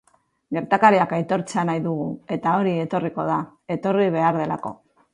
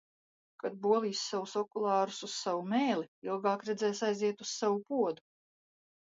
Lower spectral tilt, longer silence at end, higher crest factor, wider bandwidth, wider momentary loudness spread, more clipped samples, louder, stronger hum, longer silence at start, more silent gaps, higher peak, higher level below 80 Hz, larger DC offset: first, -7 dB/octave vs -4 dB/octave; second, 0.4 s vs 1 s; about the same, 20 dB vs 18 dB; first, 11 kHz vs 7.8 kHz; first, 12 LU vs 6 LU; neither; first, -22 LUFS vs -33 LUFS; neither; second, 0.5 s vs 0.65 s; second, none vs 3.08-3.22 s; first, -2 dBFS vs -16 dBFS; first, -64 dBFS vs -84 dBFS; neither